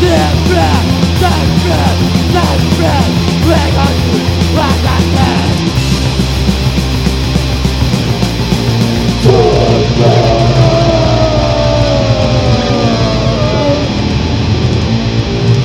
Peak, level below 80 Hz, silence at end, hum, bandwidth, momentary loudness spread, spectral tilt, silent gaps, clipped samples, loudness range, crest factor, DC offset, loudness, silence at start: 0 dBFS; -20 dBFS; 0 s; none; 16.5 kHz; 4 LU; -6 dB/octave; none; 0.7%; 3 LU; 10 dB; 0.2%; -11 LUFS; 0 s